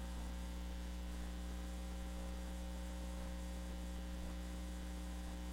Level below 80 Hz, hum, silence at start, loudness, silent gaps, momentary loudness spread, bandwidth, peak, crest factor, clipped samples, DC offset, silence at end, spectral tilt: -46 dBFS; 60 Hz at -45 dBFS; 0 s; -48 LUFS; none; 0 LU; 16.5 kHz; -36 dBFS; 10 dB; under 0.1%; under 0.1%; 0 s; -5.5 dB/octave